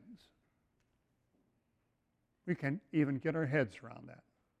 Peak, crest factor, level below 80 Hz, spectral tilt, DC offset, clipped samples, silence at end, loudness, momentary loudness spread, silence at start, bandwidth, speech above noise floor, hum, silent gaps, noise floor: -20 dBFS; 20 dB; -76 dBFS; -8.5 dB/octave; under 0.1%; under 0.1%; 0.45 s; -36 LUFS; 18 LU; 0.05 s; 9.2 kHz; 45 dB; none; none; -81 dBFS